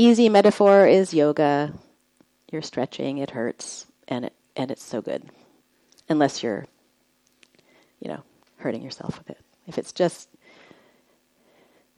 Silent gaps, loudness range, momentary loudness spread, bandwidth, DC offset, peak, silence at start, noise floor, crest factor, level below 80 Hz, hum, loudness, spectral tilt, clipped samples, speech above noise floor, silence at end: none; 12 LU; 21 LU; 12 kHz; under 0.1%; -2 dBFS; 0 s; -66 dBFS; 20 dB; -68 dBFS; none; -22 LUFS; -5.5 dB/octave; under 0.1%; 44 dB; 1.75 s